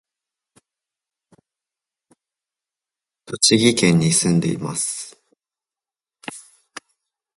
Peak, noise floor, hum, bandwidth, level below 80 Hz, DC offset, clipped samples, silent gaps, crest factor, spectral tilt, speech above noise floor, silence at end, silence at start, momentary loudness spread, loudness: -2 dBFS; under -90 dBFS; none; 11.5 kHz; -60 dBFS; under 0.1%; under 0.1%; none; 22 dB; -4 dB/octave; over 72 dB; 0.95 s; 3.3 s; 26 LU; -17 LUFS